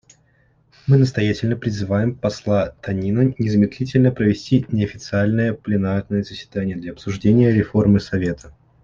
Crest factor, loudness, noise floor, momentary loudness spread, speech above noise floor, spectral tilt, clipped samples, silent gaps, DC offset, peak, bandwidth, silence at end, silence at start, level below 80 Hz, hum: 16 dB; -19 LUFS; -58 dBFS; 9 LU; 40 dB; -8 dB/octave; under 0.1%; none; under 0.1%; -2 dBFS; 7.4 kHz; 0.35 s; 0.85 s; -46 dBFS; none